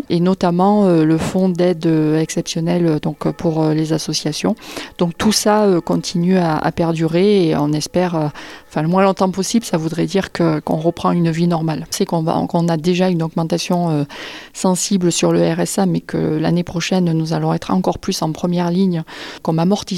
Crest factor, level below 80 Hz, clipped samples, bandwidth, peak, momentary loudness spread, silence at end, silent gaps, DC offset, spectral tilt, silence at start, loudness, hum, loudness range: 14 dB; -48 dBFS; under 0.1%; 13.5 kHz; -2 dBFS; 7 LU; 0 s; none; under 0.1%; -6 dB/octave; 0.1 s; -17 LUFS; none; 2 LU